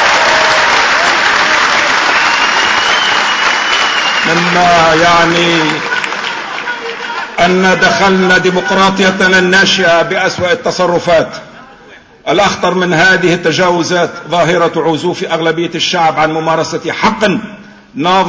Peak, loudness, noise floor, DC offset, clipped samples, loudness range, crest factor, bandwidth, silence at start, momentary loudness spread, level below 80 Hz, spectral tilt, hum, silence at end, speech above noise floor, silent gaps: 0 dBFS; -10 LUFS; -38 dBFS; under 0.1%; under 0.1%; 4 LU; 10 dB; 8 kHz; 0 s; 9 LU; -44 dBFS; -3.5 dB/octave; none; 0 s; 28 dB; none